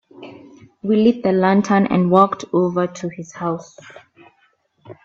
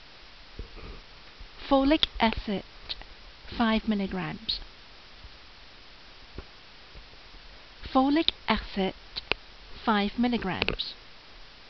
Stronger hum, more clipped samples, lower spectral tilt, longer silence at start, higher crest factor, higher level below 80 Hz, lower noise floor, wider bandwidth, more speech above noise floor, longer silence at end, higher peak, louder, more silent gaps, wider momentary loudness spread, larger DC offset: neither; neither; first, -7 dB/octave vs -3 dB/octave; first, 0.2 s vs 0 s; second, 18 dB vs 26 dB; second, -60 dBFS vs -46 dBFS; first, -61 dBFS vs -51 dBFS; first, 7.6 kHz vs 6.2 kHz; first, 44 dB vs 24 dB; about the same, 0.1 s vs 0 s; first, 0 dBFS vs -4 dBFS; first, -18 LUFS vs -28 LUFS; neither; second, 15 LU vs 25 LU; second, under 0.1% vs 0.2%